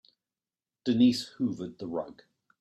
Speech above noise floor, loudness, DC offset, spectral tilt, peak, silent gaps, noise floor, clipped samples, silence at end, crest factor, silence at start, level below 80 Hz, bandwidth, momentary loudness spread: over 62 dB; -29 LUFS; under 0.1%; -6 dB/octave; -12 dBFS; none; under -90 dBFS; under 0.1%; 0.5 s; 18 dB; 0.85 s; -70 dBFS; 12.5 kHz; 14 LU